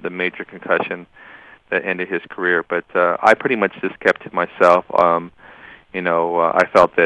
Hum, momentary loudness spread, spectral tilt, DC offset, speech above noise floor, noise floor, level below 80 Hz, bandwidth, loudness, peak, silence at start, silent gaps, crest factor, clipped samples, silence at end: none; 10 LU; -5.5 dB/octave; under 0.1%; 25 dB; -42 dBFS; -56 dBFS; 11 kHz; -18 LUFS; 0 dBFS; 0 s; none; 18 dB; under 0.1%; 0 s